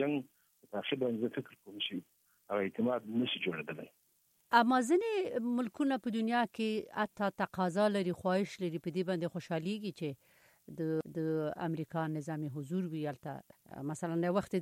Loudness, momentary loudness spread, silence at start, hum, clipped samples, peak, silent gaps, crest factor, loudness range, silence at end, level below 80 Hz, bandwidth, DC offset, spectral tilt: -35 LUFS; 13 LU; 0 s; none; under 0.1%; -14 dBFS; none; 22 dB; 5 LU; 0 s; -76 dBFS; 16.5 kHz; under 0.1%; -6 dB/octave